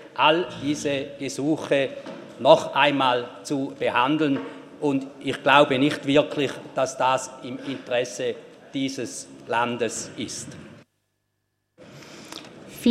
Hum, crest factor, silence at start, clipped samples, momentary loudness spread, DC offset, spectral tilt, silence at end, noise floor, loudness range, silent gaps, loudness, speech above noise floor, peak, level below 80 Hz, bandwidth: none; 24 dB; 0 s; under 0.1%; 20 LU; under 0.1%; -4 dB/octave; 0 s; -75 dBFS; 9 LU; none; -23 LUFS; 52 dB; 0 dBFS; -66 dBFS; 14 kHz